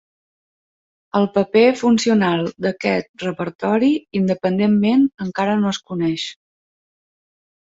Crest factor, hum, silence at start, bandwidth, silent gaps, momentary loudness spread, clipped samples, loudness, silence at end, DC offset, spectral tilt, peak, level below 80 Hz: 16 dB; none; 1.15 s; 7.8 kHz; 3.09-3.14 s, 3.55-3.59 s; 9 LU; under 0.1%; -18 LUFS; 1.4 s; under 0.1%; -6 dB/octave; -2 dBFS; -60 dBFS